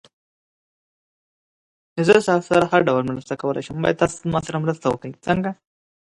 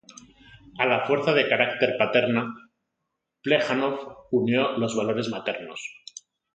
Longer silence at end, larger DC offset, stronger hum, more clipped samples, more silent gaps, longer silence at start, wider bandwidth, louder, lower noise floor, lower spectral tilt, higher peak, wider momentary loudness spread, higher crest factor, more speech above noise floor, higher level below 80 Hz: about the same, 0.6 s vs 0.6 s; neither; neither; neither; neither; first, 1.95 s vs 0.15 s; first, 11.5 kHz vs 9.2 kHz; first, -21 LUFS vs -24 LUFS; first, under -90 dBFS vs -81 dBFS; about the same, -6 dB/octave vs -5 dB/octave; first, 0 dBFS vs -6 dBFS; second, 11 LU vs 16 LU; about the same, 22 dB vs 20 dB; first, over 70 dB vs 57 dB; first, -52 dBFS vs -68 dBFS